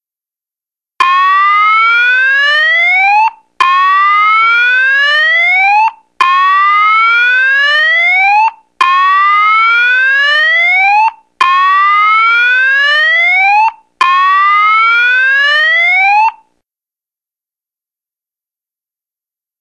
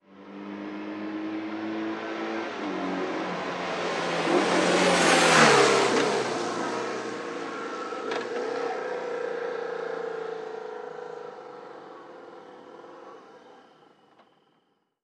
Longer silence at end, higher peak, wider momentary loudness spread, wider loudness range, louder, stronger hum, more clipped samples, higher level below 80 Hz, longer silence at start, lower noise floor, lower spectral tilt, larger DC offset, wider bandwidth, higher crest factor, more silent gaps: first, 3.3 s vs 1.45 s; first, 0 dBFS vs -4 dBFS; second, 4 LU vs 25 LU; second, 2 LU vs 19 LU; first, -7 LUFS vs -26 LUFS; neither; neither; first, -68 dBFS vs -74 dBFS; first, 1 s vs 0.1 s; first, -90 dBFS vs -71 dBFS; second, 2 dB/octave vs -3 dB/octave; neither; second, 10.5 kHz vs 13 kHz; second, 10 dB vs 24 dB; neither